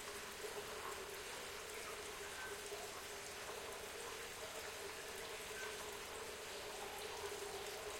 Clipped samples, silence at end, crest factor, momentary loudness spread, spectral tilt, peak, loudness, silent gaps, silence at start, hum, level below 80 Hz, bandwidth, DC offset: under 0.1%; 0 s; 16 dB; 2 LU; -1 dB/octave; -34 dBFS; -48 LUFS; none; 0 s; none; -70 dBFS; 16.5 kHz; under 0.1%